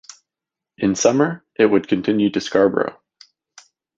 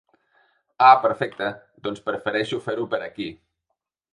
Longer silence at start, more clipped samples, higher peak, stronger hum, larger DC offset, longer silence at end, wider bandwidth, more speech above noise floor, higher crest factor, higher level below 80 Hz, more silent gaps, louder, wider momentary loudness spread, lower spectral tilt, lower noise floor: about the same, 0.8 s vs 0.8 s; neither; about the same, -2 dBFS vs -2 dBFS; neither; neither; first, 1.05 s vs 0.8 s; second, 7.8 kHz vs 10 kHz; first, 69 dB vs 58 dB; about the same, 18 dB vs 22 dB; first, -58 dBFS vs -66 dBFS; neither; first, -18 LUFS vs -22 LUFS; second, 7 LU vs 18 LU; about the same, -5 dB/octave vs -5.5 dB/octave; first, -87 dBFS vs -79 dBFS